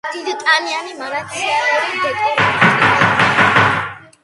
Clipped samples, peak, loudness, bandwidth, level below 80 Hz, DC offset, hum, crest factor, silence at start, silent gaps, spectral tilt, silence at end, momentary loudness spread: under 0.1%; 0 dBFS; -14 LUFS; 11.5 kHz; -48 dBFS; under 0.1%; none; 16 dB; 0.05 s; none; -4 dB/octave; 0.25 s; 12 LU